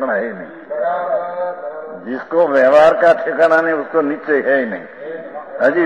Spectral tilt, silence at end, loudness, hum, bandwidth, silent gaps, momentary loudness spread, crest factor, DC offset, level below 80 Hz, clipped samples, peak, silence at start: -6 dB/octave; 0 s; -15 LUFS; none; 9.4 kHz; none; 18 LU; 14 dB; 0.2%; -60 dBFS; under 0.1%; -2 dBFS; 0 s